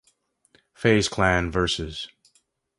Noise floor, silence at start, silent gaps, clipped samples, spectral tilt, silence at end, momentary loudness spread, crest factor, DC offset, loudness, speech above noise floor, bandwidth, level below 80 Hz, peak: -67 dBFS; 0.8 s; none; under 0.1%; -4.5 dB/octave; 0.7 s; 14 LU; 20 dB; under 0.1%; -23 LUFS; 45 dB; 11.5 kHz; -42 dBFS; -6 dBFS